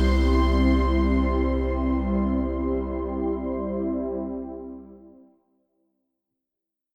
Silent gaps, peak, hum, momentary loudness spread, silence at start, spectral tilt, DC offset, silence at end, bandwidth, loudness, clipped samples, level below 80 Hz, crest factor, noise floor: none; -10 dBFS; none; 12 LU; 0 s; -8.5 dB/octave; under 0.1%; 1.85 s; 7.2 kHz; -25 LUFS; under 0.1%; -28 dBFS; 14 dB; -86 dBFS